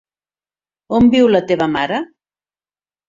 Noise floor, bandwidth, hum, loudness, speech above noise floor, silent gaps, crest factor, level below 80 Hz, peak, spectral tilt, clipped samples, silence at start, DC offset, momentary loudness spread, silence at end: under -90 dBFS; 7.4 kHz; 50 Hz at -45 dBFS; -15 LUFS; over 77 dB; none; 16 dB; -48 dBFS; -2 dBFS; -6.5 dB/octave; under 0.1%; 0.9 s; under 0.1%; 11 LU; 1.05 s